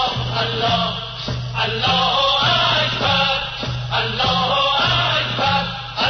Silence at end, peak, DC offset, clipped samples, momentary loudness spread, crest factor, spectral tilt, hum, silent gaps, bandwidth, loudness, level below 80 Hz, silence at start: 0 s; -6 dBFS; under 0.1%; under 0.1%; 9 LU; 12 dB; -4.5 dB/octave; none; none; 6.6 kHz; -17 LUFS; -40 dBFS; 0 s